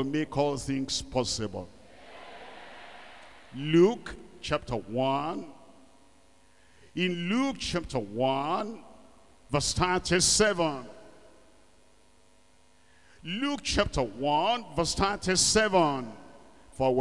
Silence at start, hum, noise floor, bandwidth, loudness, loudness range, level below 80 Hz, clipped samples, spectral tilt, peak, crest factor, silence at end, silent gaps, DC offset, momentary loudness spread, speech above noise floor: 0 s; none; -63 dBFS; 12 kHz; -28 LUFS; 7 LU; -50 dBFS; under 0.1%; -3.5 dB/octave; -10 dBFS; 20 dB; 0 s; none; 0.3%; 23 LU; 35 dB